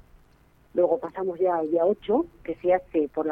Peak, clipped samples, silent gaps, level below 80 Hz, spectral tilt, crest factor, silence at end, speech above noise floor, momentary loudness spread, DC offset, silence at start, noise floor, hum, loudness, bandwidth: -10 dBFS; under 0.1%; none; -58 dBFS; -9 dB/octave; 16 dB; 0 s; 34 dB; 7 LU; under 0.1%; 0.75 s; -58 dBFS; none; -25 LUFS; 3.8 kHz